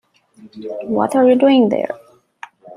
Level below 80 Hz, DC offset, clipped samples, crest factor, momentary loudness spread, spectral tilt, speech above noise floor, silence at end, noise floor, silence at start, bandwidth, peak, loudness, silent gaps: -66 dBFS; under 0.1%; under 0.1%; 14 dB; 19 LU; -6.5 dB/octave; 26 dB; 0 s; -40 dBFS; 0.45 s; 11.5 kHz; -2 dBFS; -15 LUFS; none